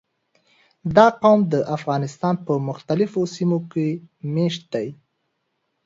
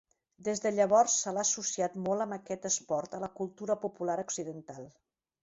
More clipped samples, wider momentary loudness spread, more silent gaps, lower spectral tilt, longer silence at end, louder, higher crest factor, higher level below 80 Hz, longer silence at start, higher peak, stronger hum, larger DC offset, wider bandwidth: neither; about the same, 13 LU vs 14 LU; neither; first, -7 dB/octave vs -3 dB/octave; first, 0.9 s vs 0.55 s; first, -21 LUFS vs -31 LUFS; about the same, 20 dB vs 20 dB; first, -60 dBFS vs -74 dBFS; first, 0.85 s vs 0.4 s; first, 0 dBFS vs -12 dBFS; neither; neither; about the same, 7.8 kHz vs 8.2 kHz